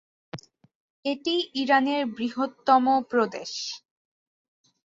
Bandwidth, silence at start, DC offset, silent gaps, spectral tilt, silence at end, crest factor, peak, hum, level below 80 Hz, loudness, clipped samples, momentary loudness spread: 7.8 kHz; 0.35 s; under 0.1%; 0.75-1.03 s; -3.5 dB/octave; 1.1 s; 20 dB; -6 dBFS; none; -72 dBFS; -25 LUFS; under 0.1%; 21 LU